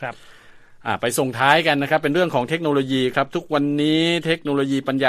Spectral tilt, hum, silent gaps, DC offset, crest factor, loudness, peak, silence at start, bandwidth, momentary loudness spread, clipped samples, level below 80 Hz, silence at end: -5 dB/octave; none; none; under 0.1%; 20 dB; -20 LUFS; 0 dBFS; 0 s; 14.5 kHz; 7 LU; under 0.1%; -58 dBFS; 0 s